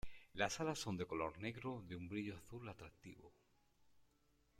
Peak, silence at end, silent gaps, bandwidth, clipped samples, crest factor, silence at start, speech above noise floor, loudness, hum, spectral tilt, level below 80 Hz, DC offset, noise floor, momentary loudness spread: -24 dBFS; 0.5 s; none; 16 kHz; under 0.1%; 24 dB; 0.05 s; 31 dB; -46 LUFS; none; -4.5 dB/octave; -68 dBFS; under 0.1%; -77 dBFS; 17 LU